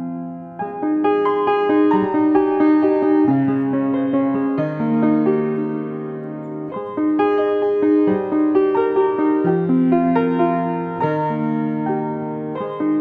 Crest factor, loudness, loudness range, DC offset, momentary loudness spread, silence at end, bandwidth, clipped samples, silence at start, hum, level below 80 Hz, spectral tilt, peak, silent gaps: 14 dB; -18 LUFS; 4 LU; under 0.1%; 11 LU; 0 s; 4.6 kHz; under 0.1%; 0 s; none; -64 dBFS; -10.5 dB/octave; -4 dBFS; none